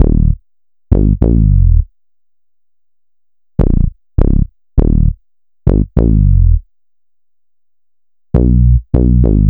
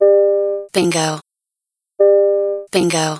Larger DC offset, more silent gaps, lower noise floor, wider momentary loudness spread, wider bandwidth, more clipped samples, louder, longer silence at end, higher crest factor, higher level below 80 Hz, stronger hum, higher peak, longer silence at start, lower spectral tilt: neither; neither; about the same, -87 dBFS vs -84 dBFS; about the same, 7 LU vs 7 LU; second, 2.1 kHz vs 11 kHz; neither; about the same, -13 LUFS vs -15 LUFS; about the same, 0 s vs 0 s; about the same, 12 dB vs 14 dB; first, -14 dBFS vs -62 dBFS; neither; about the same, 0 dBFS vs -2 dBFS; about the same, 0 s vs 0 s; first, -13 dB/octave vs -4.5 dB/octave